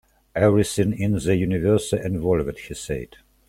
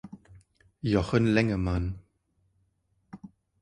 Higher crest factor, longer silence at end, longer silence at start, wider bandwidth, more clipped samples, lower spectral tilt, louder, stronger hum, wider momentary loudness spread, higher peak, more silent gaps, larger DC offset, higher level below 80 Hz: about the same, 18 dB vs 22 dB; about the same, 0.4 s vs 0.35 s; first, 0.35 s vs 0.05 s; first, 15.5 kHz vs 11 kHz; neither; about the same, -6.5 dB/octave vs -7.5 dB/octave; first, -22 LUFS vs -27 LUFS; neither; second, 12 LU vs 24 LU; first, -4 dBFS vs -8 dBFS; neither; neither; about the same, -44 dBFS vs -44 dBFS